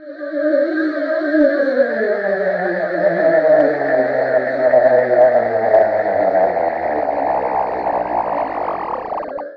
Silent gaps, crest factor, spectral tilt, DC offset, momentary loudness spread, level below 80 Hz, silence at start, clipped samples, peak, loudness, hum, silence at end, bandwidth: none; 12 dB; -8.5 dB/octave; under 0.1%; 8 LU; -54 dBFS; 0 s; under 0.1%; -2 dBFS; -16 LUFS; none; 0 s; 5.2 kHz